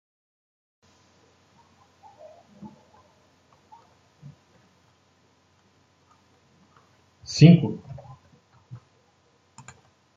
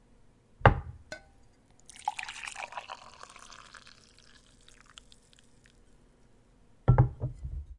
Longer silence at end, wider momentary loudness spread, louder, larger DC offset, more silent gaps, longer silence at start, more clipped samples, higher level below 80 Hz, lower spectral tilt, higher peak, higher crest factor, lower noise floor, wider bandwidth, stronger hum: first, 2.25 s vs 0.05 s; first, 33 LU vs 27 LU; first, -18 LUFS vs -30 LUFS; neither; neither; first, 2.65 s vs 0.6 s; neither; second, -64 dBFS vs -42 dBFS; about the same, -7 dB/octave vs -6.5 dB/octave; about the same, -2 dBFS vs -2 dBFS; second, 26 dB vs 32 dB; about the same, -63 dBFS vs -61 dBFS; second, 7.6 kHz vs 11 kHz; neither